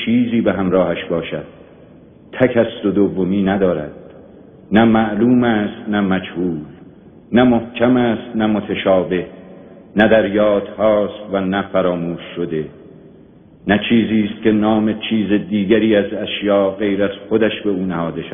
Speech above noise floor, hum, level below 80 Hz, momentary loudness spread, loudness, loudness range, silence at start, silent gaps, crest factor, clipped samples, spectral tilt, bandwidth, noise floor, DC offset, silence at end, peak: 28 dB; none; -48 dBFS; 10 LU; -17 LUFS; 3 LU; 0 s; none; 16 dB; under 0.1%; -5 dB/octave; 3.7 kHz; -44 dBFS; under 0.1%; 0 s; 0 dBFS